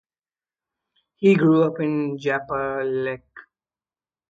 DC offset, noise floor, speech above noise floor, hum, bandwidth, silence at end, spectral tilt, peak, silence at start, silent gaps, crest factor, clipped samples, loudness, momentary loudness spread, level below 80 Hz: under 0.1%; under -90 dBFS; over 70 dB; none; 7.8 kHz; 0.9 s; -8.5 dB/octave; -4 dBFS; 1.2 s; none; 18 dB; under 0.1%; -21 LUFS; 10 LU; -62 dBFS